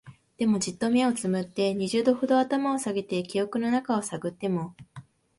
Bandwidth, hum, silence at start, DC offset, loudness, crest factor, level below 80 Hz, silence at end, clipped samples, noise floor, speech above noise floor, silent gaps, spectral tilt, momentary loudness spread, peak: 11.5 kHz; none; 0.05 s; under 0.1%; -27 LUFS; 18 dB; -66 dBFS; 0.4 s; under 0.1%; -49 dBFS; 23 dB; none; -5 dB/octave; 6 LU; -10 dBFS